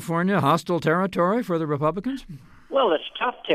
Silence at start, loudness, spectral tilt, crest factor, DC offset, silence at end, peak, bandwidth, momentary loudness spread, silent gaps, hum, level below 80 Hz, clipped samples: 0 s; -23 LUFS; -6.5 dB/octave; 16 dB; under 0.1%; 0 s; -8 dBFS; 15 kHz; 7 LU; none; none; -54 dBFS; under 0.1%